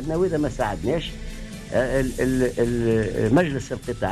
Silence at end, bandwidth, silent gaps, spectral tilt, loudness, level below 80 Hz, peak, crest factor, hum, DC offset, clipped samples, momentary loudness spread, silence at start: 0 s; 14 kHz; none; -6.5 dB/octave; -23 LUFS; -36 dBFS; -8 dBFS; 14 dB; none; under 0.1%; under 0.1%; 11 LU; 0 s